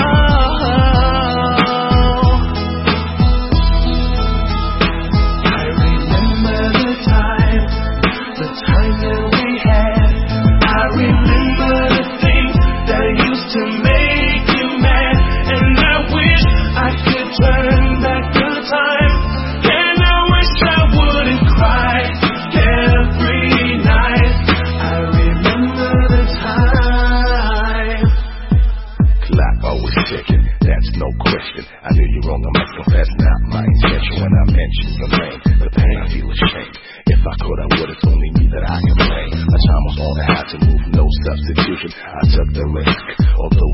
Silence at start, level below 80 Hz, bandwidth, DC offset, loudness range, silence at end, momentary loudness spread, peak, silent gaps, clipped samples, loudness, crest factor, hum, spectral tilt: 0 s; -16 dBFS; 5.8 kHz; under 0.1%; 4 LU; 0 s; 5 LU; 0 dBFS; none; under 0.1%; -14 LUFS; 12 dB; none; -10 dB/octave